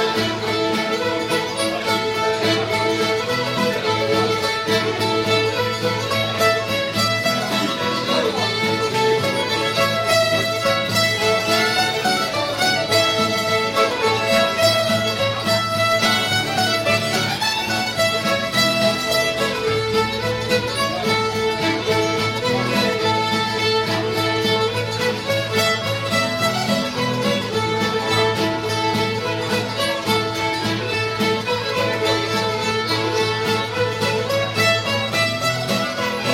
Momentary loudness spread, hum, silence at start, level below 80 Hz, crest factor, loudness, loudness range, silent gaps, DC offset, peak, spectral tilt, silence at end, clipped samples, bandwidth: 4 LU; none; 0 s; -50 dBFS; 14 dB; -19 LUFS; 2 LU; none; under 0.1%; -6 dBFS; -3.5 dB/octave; 0 s; under 0.1%; 16.5 kHz